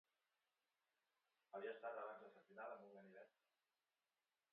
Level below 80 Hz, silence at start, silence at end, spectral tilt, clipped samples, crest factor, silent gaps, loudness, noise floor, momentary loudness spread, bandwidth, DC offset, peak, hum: under -90 dBFS; 1.55 s; 1.25 s; -2.5 dB/octave; under 0.1%; 20 dB; none; -56 LUFS; under -90 dBFS; 12 LU; 4.3 kHz; under 0.1%; -40 dBFS; none